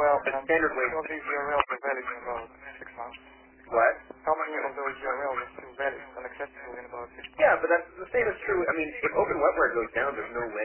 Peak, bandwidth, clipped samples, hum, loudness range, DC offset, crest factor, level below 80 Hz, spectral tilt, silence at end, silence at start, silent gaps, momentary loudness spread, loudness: -6 dBFS; 3.2 kHz; under 0.1%; none; 5 LU; under 0.1%; 22 dB; -58 dBFS; -8 dB/octave; 0 s; 0 s; none; 17 LU; -28 LUFS